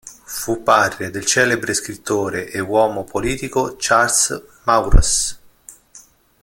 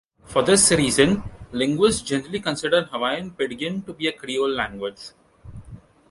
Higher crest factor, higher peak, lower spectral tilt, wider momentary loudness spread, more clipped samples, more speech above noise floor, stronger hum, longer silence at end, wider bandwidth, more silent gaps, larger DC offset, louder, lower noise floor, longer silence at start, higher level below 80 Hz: about the same, 18 dB vs 20 dB; about the same, 0 dBFS vs -2 dBFS; about the same, -3 dB/octave vs -3.5 dB/octave; second, 9 LU vs 16 LU; neither; first, 30 dB vs 22 dB; neither; about the same, 0.45 s vs 0.35 s; first, 17 kHz vs 11.5 kHz; neither; neither; first, -18 LUFS vs -21 LUFS; about the same, -47 dBFS vs -44 dBFS; second, 0.05 s vs 0.3 s; first, -24 dBFS vs -48 dBFS